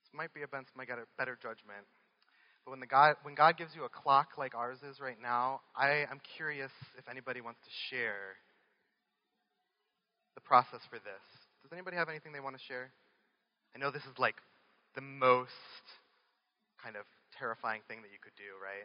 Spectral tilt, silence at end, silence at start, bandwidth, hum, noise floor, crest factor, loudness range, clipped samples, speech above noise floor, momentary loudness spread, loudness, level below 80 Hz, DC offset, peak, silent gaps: -1.5 dB/octave; 0 s; 0.15 s; 5.4 kHz; none; -84 dBFS; 26 dB; 12 LU; under 0.1%; 49 dB; 23 LU; -34 LUFS; under -90 dBFS; under 0.1%; -10 dBFS; none